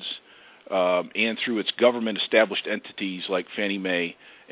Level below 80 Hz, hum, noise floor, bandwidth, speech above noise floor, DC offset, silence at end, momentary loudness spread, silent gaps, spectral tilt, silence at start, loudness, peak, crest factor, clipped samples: -76 dBFS; none; -51 dBFS; 4 kHz; 26 dB; under 0.1%; 0.2 s; 10 LU; none; -8 dB/octave; 0 s; -25 LUFS; -6 dBFS; 20 dB; under 0.1%